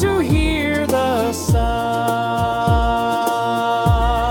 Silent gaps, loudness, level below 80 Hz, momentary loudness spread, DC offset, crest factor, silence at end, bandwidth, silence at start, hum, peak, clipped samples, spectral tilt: none; -18 LUFS; -26 dBFS; 3 LU; under 0.1%; 14 dB; 0 s; 18 kHz; 0 s; none; -4 dBFS; under 0.1%; -6 dB/octave